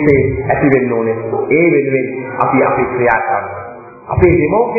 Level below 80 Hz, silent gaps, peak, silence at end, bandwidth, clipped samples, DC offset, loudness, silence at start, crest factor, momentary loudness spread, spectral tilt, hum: -34 dBFS; none; 0 dBFS; 0 s; 2.7 kHz; under 0.1%; under 0.1%; -13 LUFS; 0 s; 14 dB; 10 LU; -11.5 dB/octave; none